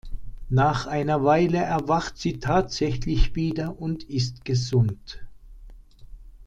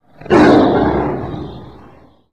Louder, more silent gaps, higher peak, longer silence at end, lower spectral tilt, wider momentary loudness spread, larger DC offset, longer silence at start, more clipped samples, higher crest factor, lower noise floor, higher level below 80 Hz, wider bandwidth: second, -24 LUFS vs -12 LUFS; neither; second, -6 dBFS vs -2 dBFS; second, 0.05 s vs 0.6 s; about the same, -6.5 dB/octave vs -7.5 dB/octave; second, 11 LU vs 18 LU; second, under 0.1% vs 0.6%; second, 0.05 s vs 0.2 s; neither; first, 18 dB vs 12 dB; about the same, -45 dBFS vs -44 dBFS; about the same, -34 dBFS vs -36 dBFS; about the same, 8.6 kHz vs 9.4 kHz